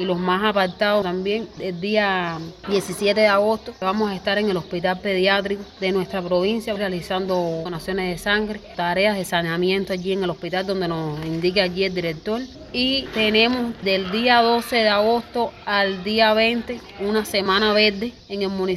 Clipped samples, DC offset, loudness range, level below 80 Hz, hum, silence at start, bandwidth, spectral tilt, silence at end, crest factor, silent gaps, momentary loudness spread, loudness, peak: under 0.1%; under 0.1%; 4 LU; -50 dBFS; none; 0 s; 15.5 kHz; -5 dB/octave; 0 s; 18 dB; none; 10 LU; -21 LUFS; -4 dBFS